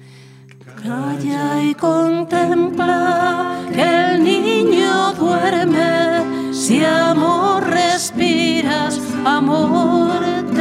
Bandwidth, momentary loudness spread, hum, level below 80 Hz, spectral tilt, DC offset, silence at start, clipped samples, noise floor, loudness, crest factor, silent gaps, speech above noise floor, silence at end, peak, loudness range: 15 kHz; 6 LU; none; -64 dBFS; -4.5 dB/octave; under 0.1%; 0 s; under 0.1%; -41 dBFS; -16 LUFS; 14 dB; none; 25 dB; 0 s; -2 dBFS; 2 LU